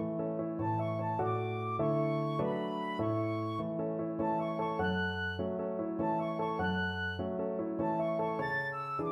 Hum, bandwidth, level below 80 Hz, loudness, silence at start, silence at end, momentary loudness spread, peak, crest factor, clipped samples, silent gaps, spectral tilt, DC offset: none; 10.5 kHz; -64 dBFS; -34 LUFS; 0 s; 0 s; 3 LU; -20 dBFS; 14 dB; under 0.1%; none; -8.5 dB/octave; under 0.1%